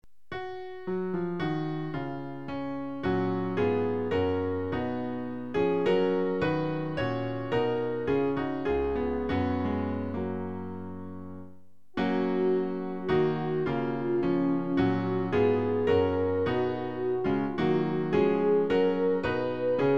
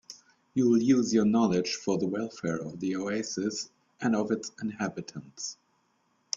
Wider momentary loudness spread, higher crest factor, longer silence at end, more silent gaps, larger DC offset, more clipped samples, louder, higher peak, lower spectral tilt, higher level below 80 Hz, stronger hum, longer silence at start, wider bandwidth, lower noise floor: second, 11 LU vs 14 LU; about the same, 16 dB vs 18 dB; second, 0 s vs 0.85 s; neither; first, 0.5% vs under 0.1%; neither; about the same, -29 LUFS vs -29 LUFS; about the same, -12 dBFS vs -10 dBFS; first, -8.5 dB/octave vs -5 dB/octave; first, -54 dBFS vs -68 dBFS; neither; first, 0.3 s vs 0.1 s; about the same, 7 kHz vs 7.6 kHz; second, -56 dBFS vs -72 dBFS